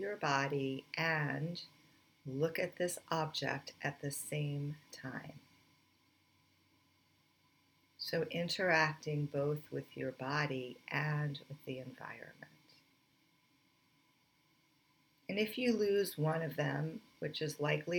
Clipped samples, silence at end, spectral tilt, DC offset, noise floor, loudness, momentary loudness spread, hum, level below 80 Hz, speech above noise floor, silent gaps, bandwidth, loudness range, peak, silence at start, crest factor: under 0.1%; 0 s; -5 dB/octave; under 0.1%; -73 dBFS; -38 LUFS; 14 LU; none; -80 dBFS; 36 dB; none; 19.5 kHz; 14 LU; -18 dBFS; 0 s; 22 dB